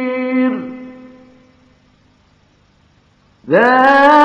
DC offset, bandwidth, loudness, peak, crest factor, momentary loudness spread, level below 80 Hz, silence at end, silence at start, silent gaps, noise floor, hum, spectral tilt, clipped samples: under 0.1%; 9.4 kHz; -12 LUFS; 0 dBFS; 16 dB; 23 LU; -58 dBFS; 0 s; 0 s; none; -53 dBFS; none; -6 dB/octave; 0.4%